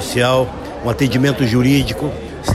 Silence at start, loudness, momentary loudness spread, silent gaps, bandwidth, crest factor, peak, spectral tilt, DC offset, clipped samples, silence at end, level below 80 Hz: 0 s; -16 LUFS; 10 LU; none; 15 kHz; 12 dB; -4 dBFS; -6 dB/octave; under 0.1%; under 0.1%; 0 s; -34 dBFS